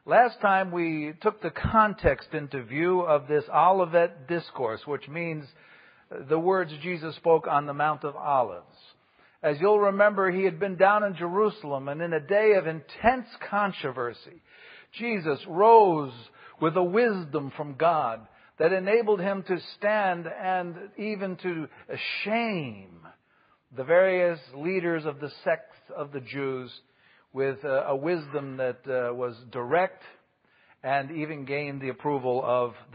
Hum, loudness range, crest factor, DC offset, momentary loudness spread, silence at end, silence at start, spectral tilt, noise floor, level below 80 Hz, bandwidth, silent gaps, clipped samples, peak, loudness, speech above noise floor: none; 7 LU; 22 dB; under 0.1%; 13 LU; 0.15 s; 0.05 s; -10.5 dB/octave; -65 dBFS; -56 dBFS; 5.2 kHz; none; under 0.1%; -6 dBFS; -26 LUFS; 39 dB